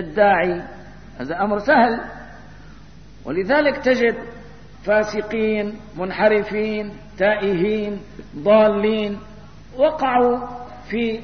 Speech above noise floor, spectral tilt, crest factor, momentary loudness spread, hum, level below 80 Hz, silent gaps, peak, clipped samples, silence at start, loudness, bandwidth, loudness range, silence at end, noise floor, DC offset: 24 dB; -6.5 dB/octave; 18 dB; 18 LU; none; -46 dBFS; none; -4 dBFS; under 0.1%; 0 s; -19 LUFS; 6.6 kHz; 3 LU; 0 s; -43 dBFS; 0.6%